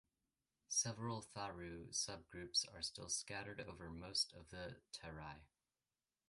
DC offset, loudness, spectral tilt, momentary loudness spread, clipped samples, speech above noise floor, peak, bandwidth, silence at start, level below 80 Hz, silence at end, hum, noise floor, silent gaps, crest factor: under 0.1%; -45 LUFS; -2 dB/octave; 13 LU; under 0.1%; over 42 dB; -26 dBFS; 11.5 kHz; 0.7 s; -68 dBFS; 0.85 s; none; under -90 dBFS; none; 22 dB